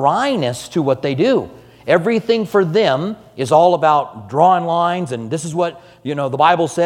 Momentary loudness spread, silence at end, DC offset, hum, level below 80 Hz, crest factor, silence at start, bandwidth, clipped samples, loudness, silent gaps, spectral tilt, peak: 10 LU; 0 s; under 0.1%; none; -58 dBFS; 16 dB; 0 s; 15.5 kHz; under 0.1%; -16 LUFS; none; -5.5 dB/octave; 0 dBFS